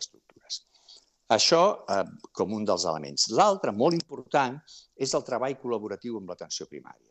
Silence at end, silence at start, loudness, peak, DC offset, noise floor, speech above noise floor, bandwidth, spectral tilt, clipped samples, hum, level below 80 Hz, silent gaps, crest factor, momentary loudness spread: 0.3 s; 0 s; -27 LUFS; -6 dBFS; under 0.1%; -57 dBFS; 29 dB; 8.8 kHz; -3.5 dB/octave; under 0.1%; none; -74 dBFS; none; 22 dB; 16 LU